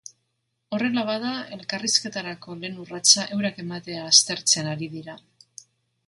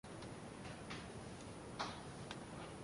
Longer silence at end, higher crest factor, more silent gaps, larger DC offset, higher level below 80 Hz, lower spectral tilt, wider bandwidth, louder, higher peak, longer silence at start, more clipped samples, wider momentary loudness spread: first, 0.9 s vs 0 s; about the same, 24 dB vs 20 dB; neither; neither; about the same, -70 dBFS vs -66 dBFS; second, -1.5 dB/octave vs -4.5 dB/octave; about the same, 11.5 kHz vs 11.5 kHz; first, -21 LUFS vs -50 LUFS; first, -2 dBFS vs -30 dBFS; first, 0.7 s vs 0.05 s; neither; first, 18 LU vs 5 LU